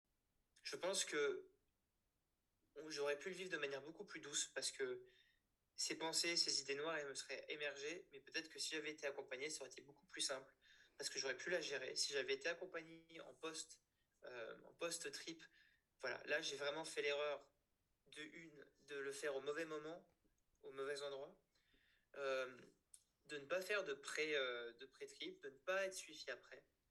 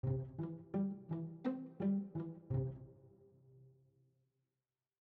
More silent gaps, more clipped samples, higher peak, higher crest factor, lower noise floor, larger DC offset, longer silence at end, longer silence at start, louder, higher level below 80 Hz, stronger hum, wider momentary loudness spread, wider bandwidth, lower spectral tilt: neither; neither; about the same, -26 dBFS vs -28 dBFS; first, 24 dB vs 16 dB; about the same, -89 dBFS vs under -90 dBFS; neither; second, 0.3 s vs 1.3 s; first, 0.65 s vs 0.05 s; second, -46 LUFS vs -42 LUFS; second, -90 dBFS vs -66 dBFS; neither; first, 17 LU vs 8 LU; first, 13 kHz vs 4.2 kHz; second, -1 dB/octave vs -11 dB/octave